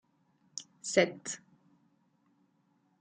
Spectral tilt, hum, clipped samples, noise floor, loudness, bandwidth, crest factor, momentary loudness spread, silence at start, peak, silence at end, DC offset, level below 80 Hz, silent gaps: -3 dB/octave; none; under 0.1%; -73 dBFS; -32 LUFS; 9.6 kHz; 28 dB; 17 LU; 0.55 s; -10 dBFS; 1.65 s; under 0.1%; -82 dBFS; none